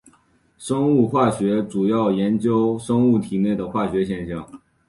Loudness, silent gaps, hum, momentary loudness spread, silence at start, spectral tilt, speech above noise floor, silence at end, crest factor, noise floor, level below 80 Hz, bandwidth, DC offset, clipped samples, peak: -20 LUFS; none; none; 8 LU; 0.6 s; -7.5 dB/octave; 40 dB; 0.3 s; 16 dB; -59 dBFS; -52 dBFS; 11.5 kHz; under 0.1%; under 0.1%; -4 dBFS